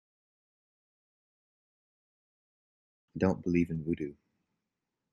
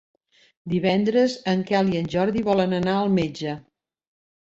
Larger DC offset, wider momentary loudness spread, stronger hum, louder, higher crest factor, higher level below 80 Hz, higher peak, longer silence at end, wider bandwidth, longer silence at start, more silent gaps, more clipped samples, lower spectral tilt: neither; about the same, 11 LU vs 10 LU; neither; second, -32 LUFS vs -22 LUFS; first, 22 dB vs 16 dB; second, -64 dBFS vs -56 dBFS; second, -14 dBFS vs -6 dBFS; first, 1 s vs 0.8 s; about the same, 7.2 kHz vs 7.8 kHz; first, 3.15 s vs 0.65 s; neither; neither; first, -8.5 dB/octave vs -7 dB/octave